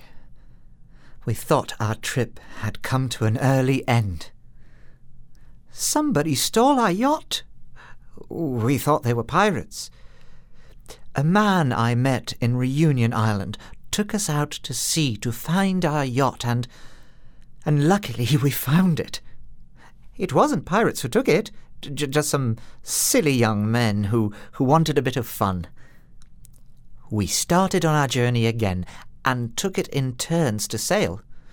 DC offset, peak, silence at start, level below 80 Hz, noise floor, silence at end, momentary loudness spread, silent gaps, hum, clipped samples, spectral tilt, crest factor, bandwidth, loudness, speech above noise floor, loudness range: under 0.1%; -4 dBFS; 0 s; -46 dBFS; -44 dBFS; 0.05 s; 12 LU; none; none; under 0.1%; -5 dB/octave; 20 dB; over 20 kHz; -22 LUFS; 23 dB; 3 LU